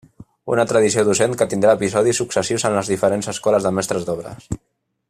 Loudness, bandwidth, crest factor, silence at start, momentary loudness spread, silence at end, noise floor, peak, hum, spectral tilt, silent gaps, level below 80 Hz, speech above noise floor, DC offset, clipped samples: -18 LUFS; 14.5 kHz; 16 dB; 0.2 s; 14 LU; 0.55 s; -71 dBFS; -2 dBFS; none; -4.5 dB/octave; none; -50 dBFS; 53 dB; under 0.1%; under 0.1%